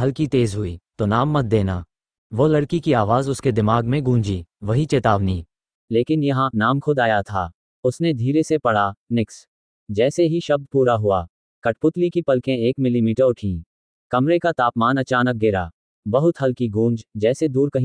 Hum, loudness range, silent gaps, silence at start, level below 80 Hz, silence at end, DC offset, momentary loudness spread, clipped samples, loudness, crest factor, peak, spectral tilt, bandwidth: none; 1 LU; 2.18-2.30 s, 5.75-5.88 s, 7.54-7.83 s, 8.97-9.07 s, 9.48-9.87 s, 11.30-11.62 s, 13.66-14.10 s, 15.73-16.03 s; 0 s; -48 dBFS; 0 s; under 0.1%; 8 LU; under 0.1%; -20 LUFS; 18 dB; -2 dBFS; -7 dB/octave; 10.5 kHz